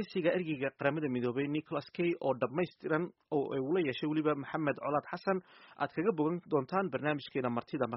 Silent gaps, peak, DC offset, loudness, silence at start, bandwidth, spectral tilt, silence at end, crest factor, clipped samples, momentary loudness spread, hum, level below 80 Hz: none; -16 dBFS; under 0.1%; -34 LUFS; 0 s; 5.8 kHz; -5.5 dB/octave; 0 s; 18 dB; under 0.1%; 4 LU; none; -74 dBFS